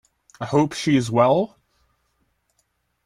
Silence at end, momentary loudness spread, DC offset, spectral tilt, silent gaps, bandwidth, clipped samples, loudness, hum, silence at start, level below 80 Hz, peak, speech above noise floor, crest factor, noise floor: 1.6 s; 11 LU; under 0.1%; -6 dB/octave; none; 13 kHz; under 0.1%; -20 LUFS; none; 0.4 s; -60 dBFS; -4 dBFS; 51 dB; 18 dB; -70 dBFS